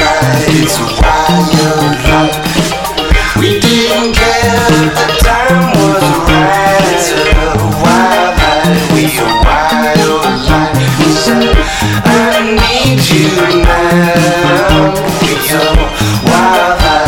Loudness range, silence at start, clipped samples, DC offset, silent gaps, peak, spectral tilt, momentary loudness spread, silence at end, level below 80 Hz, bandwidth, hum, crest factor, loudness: 1 LU; 0 s; 0.2%; under 0.1%; none; 0 dBFS; -4.5 dB/octave; 3 LU; 0 s; -18 dBFS; 18 kHz; none; 8 dB; -9 LUFS